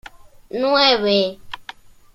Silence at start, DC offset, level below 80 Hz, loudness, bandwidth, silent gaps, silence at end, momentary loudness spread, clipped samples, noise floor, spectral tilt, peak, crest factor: 0.55 s; under 0.1%; -52 dBFS; -17 LUFS; 13 kHz; none; 0.55 s; 20 LU; under 0.1%; -41 dBFS; -4.5 dB/octave; -2 dBFS; 20 dB